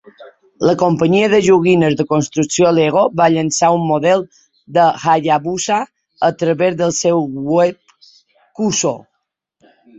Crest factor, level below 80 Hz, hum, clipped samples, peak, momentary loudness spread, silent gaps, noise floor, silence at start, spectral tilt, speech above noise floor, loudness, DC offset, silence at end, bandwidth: 14 dB; -54 dBFS; none; under 0.1%; 0 dBFS; 7 LU; none; -73 dBFS; 0.2 s; -5 dB/octave; 59 dB; -14 LUFS; under 0.1%; 1 s; 8.2 kHz